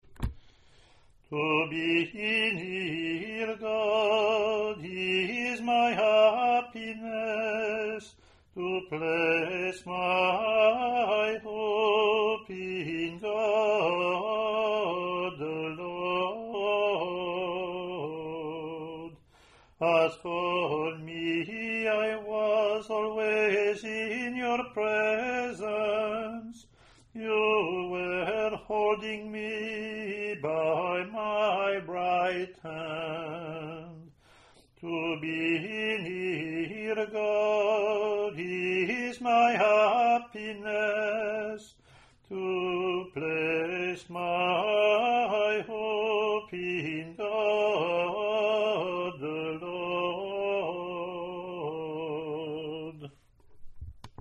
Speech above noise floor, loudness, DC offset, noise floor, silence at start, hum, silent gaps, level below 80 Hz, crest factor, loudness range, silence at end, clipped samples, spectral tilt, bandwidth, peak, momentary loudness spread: 31 dB; -29 LUFS; under 0.1%; -59 dBFS; 0.1 s; none; none; -58 dBFS; 18 dB; 6 LU; 0.1 s; under 0.1%; -5.5 dB/octave; 10.5 kHz; -12 dBFS; 11 LU